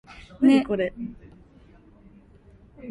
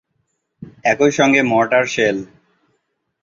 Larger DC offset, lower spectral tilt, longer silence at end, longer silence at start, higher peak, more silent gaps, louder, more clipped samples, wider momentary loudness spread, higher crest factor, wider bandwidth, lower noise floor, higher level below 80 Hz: neither; first, -6.5 dB/octave vs -4.5 dB/octave; second, 0 s vs 0.95 s; second, 0.4 s vs 0.6 s; second, -8 dBFS vs -2 dBFS; neither; second, -22 LUFS vs -15 LUFS; neither; first, 24 LU vs 7 LU; about the same, 18 dB vs 16 dB; first, 11 kHz vs 7.6 kHz; second, -52 dBFS vs -70 dBFS; about the same, -54 dBFS vs -58 dBFS